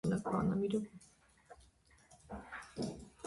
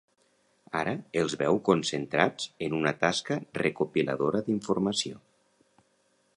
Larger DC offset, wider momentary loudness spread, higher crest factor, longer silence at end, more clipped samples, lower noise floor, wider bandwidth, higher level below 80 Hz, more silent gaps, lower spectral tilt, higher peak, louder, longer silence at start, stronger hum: neither; first, 18 LU vs 6 LU; second, 16 dB vs 24 dB; second, 0 s vs 1.2 s; neither; about the same, -67 dBFS vs -70 dBFS; about the same, 11.5 kHz vs 11 kHz; about the same, -62 dBFS vs -64 dBFS; neither; first, -7 dB/octave vs -4.5 dB/octave; second, -24 dBFS vs -6 dBFS; second, -39 LUFS vs -29 LUFS; second, 0.05 s vs 0.75 s; neither